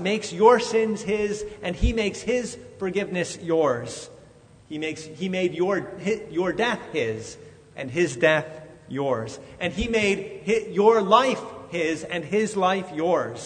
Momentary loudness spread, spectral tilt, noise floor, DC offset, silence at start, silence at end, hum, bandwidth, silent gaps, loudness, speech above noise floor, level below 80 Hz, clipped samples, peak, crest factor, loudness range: 16 LU; -5 dB/octave; -51 dBFS; under 0.1%; 0 s; 0 s; none; 9.6 kHz; none; -24 LUFS; 27 dB; -42 dBFS; under 0.1%; -2 dBFS; 22 dB; 5 LU